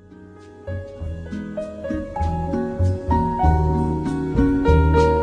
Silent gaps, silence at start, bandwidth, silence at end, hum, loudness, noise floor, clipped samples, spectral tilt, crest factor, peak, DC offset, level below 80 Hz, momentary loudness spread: none; 0.1 s; 9 kHz; 0 s; none; -21 LUFS; -43 dBFS; under 0.1%; -9 dB/octave; 16 dB; -4 dBFS; under 0.1%; -26 dBFS; 15 LU